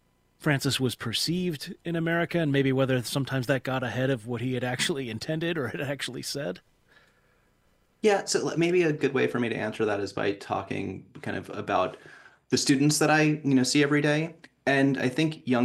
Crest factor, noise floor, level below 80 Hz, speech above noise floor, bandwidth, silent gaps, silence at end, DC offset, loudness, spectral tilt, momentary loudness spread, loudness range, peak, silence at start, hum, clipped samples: 18 dB; -66 dBFS; -64 dBFS; 40 dB; 16 kHz; none; 0 s; under 0.1%; -27 LUFS; -5 dB/octave; 10 LU; 7 LU; -8 dBFS; 0.4 s; none; under 0.1%